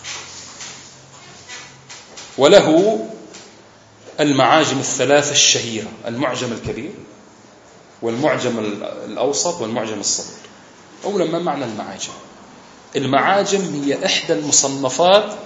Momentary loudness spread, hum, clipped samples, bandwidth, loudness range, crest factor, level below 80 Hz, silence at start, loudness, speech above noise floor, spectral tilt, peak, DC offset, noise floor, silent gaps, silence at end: 21 LU; none; under 0.1%; 8.2 kHz; 8 LU; 20 dB; -58 dBFS; 0 s; -17 LUFS; 28 dB; -3 dB/octave; 0 dBFS; under 0.1%; -46 dBFS; none; 0 s